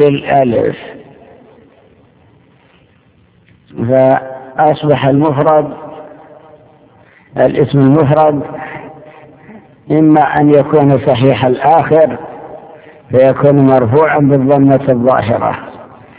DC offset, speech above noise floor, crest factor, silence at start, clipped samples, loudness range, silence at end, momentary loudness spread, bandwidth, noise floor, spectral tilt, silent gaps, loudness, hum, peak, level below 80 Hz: under 0.1%; 40 dB; 12 dB; 0 s; 0.7%; 8 LU; 0.35 s; 18 LU; 4 kHz; -49 dBFS; -11.5 dB/octave; none; -10 LUFS; none; 0 dBFS; -46 dBFS